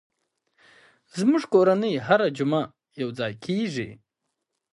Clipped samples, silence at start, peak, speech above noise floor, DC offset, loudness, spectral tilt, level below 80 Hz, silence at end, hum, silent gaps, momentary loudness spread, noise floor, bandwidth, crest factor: under 0.1%; 1.15 s; -6 dBFS; 58 dB; under 0.1%; -24 LUFS; -6.5 dB/octave; -68 dBFS; 0.8 s; none; none; 14 LU; -81 dBFS; 11.5 kHz; 18 dB